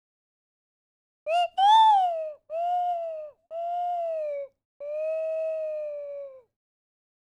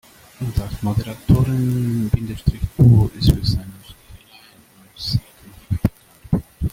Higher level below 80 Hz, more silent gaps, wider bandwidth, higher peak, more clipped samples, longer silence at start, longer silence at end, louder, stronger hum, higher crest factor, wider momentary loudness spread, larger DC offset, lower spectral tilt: second, -80 dBFS vs -32 dBFS; first, 4.65-4.80 s vs none; second, 10.5 kHz vs 16 kHz; second, -10 dBFS vs 0 dBFS; neither; first, 1.25 s vs 0.4 s; first, 0.95 s vs 0.05 s; second, -26 LUFS vs -20 LUFS; neither; about the same, 18 dB vs 20 dB; first, 21 LU vs 12 LU; neither; second, 1 dB/octave vs -7.5 dB/octave